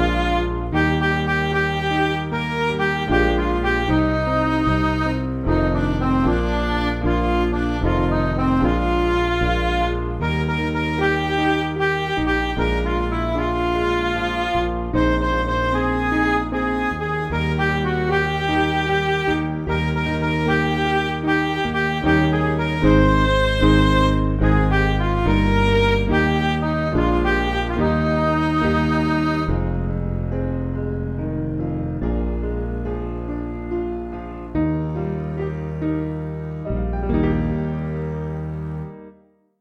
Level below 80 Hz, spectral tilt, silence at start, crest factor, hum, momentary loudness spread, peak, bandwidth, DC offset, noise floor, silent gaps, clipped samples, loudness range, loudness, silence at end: -28 dBFS; -7 dB/octave; 0 s; 16 dB; none; 8 LU; -4 dBFS; 10 kHz; 0.1%; -53 dBFS; none; under 0.1%; 8 LU; -21 LUFS; 0.5 s